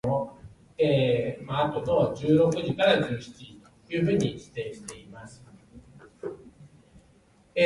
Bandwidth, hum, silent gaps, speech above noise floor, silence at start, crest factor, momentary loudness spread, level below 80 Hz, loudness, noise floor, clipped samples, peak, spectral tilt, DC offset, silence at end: 11.5 kHz; none; none; 35 dB; 0.05 s; 22 dB; 23 LU; -56 dBFS; -26 LUFS; -60 dBFS; under 0.1%; -6 dBFS; -6.5 dB/octave; under 0.1%; 0 s